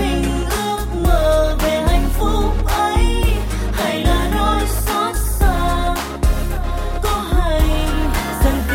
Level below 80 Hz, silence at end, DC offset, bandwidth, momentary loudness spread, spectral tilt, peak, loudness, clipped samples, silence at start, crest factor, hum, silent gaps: -18 dBFS; 0 s; under 0.1%; 17 kHz; 5 LU; -5 dB/octave; -2 dBFS; -18 LUFS; under 0.1%; 0 s; 14 dB; none; none